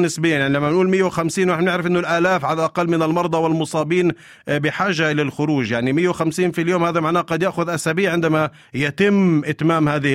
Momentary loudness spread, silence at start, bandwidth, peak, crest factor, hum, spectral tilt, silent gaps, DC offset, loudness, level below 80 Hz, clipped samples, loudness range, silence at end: 4 LU; 0 s; 15.5 kHz; -4 dBFS; 14 dB; none; -6 dB/octave; none; under 0.1%; -19 LUFS; -56 dBFS; under 0.1%; 1 LU; 0 s